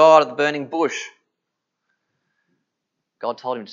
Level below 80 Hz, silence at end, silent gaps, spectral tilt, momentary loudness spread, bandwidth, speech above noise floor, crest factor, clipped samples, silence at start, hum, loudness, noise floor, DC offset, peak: -84 dBFS; 0 s; none; -4 dB/octave; 16 LU; 7.6 kHz; 56 dB; 22 dB; under 0.1%; 0 s; none; -21 LUFS; -80 dBFS; under 0.1%; 0 dBFS